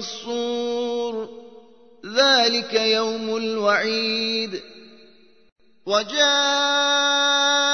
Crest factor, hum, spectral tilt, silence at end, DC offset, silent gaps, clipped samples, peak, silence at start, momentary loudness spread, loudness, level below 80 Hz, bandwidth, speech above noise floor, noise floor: 18 dB; none; -1 dB/octave; 0 s; 0.2%; 5.52-5.56 s; under 0.1%; -4 dBFS; 0 s; 12 LU; -20 LUFS; -70 dBFS; 6.6 kHz; 33 dB; -54 dBFS